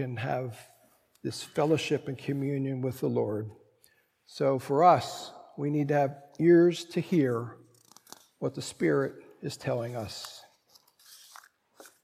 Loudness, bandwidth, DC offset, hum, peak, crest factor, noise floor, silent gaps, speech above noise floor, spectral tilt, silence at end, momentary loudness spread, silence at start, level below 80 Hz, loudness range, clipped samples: -29 LUFS; 15.5 kHz; under 0.1%; none; -8 dBFS; 22 dB; -67 dBFS; none; 39 dB; -6.5 dB/octave; 0.15 s; 19 LU; 0 s; -72 dBFS; 8 LU; under 0.1%